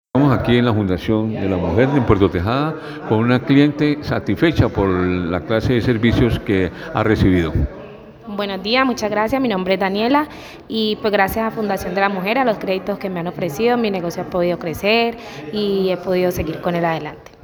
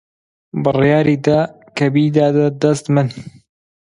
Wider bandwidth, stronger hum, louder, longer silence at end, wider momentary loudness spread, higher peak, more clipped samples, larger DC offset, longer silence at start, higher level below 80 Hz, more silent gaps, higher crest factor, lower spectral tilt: first, over 20 kHz vs 11 kHz; neither; second, -18 LUFS vs -15 LUFS; second, 0.2 s vs 0.65 s; about the same, 9 LU vs 10 LU; about the same, 0 dBFS vs 0 dBFS; neither; neither; second, 0.15 s vs 0.55 s; first, -36 dBFS vs -52 dBFS; neither; about the same, 16 dB vs 16 dB; about the same, -7 dB/octave vs -7.5 dB/octave